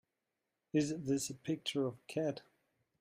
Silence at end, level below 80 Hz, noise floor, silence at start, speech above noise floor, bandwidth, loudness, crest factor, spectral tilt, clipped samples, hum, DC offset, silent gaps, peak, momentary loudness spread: 0.6 s; -76 dBFS; -88 dBFS; 0.75 s; 51 dB; 15.5 kHz; -38 LUFS; 18 dB; -5 dB/octave; under 0.1%; none; under 0.1%; none; -22 dBFS; 4 LU